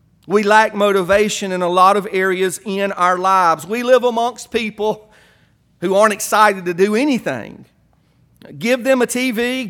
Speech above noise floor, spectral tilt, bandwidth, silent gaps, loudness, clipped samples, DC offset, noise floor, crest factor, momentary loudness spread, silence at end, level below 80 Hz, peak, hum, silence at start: 40 dB; -4 dB/octave; 18.5 kHz; none; -16 LUFS; under 0.1%; under 0.1%; -56 dBFS; 16 dB; 9 LU; 0 s; -54 dBFS; 0 dBFS; none; 0.3 s